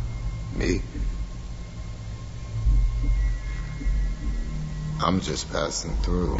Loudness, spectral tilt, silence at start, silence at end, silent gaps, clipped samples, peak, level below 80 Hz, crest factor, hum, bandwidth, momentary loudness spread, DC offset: -29 LUFS; -5.5 dB/octave; 0 s; 0 s; none; under 0.1%; -8 dBFS; -28 dBFS; 18 dB; none; 8 kHz; 12 LU; under 0.1%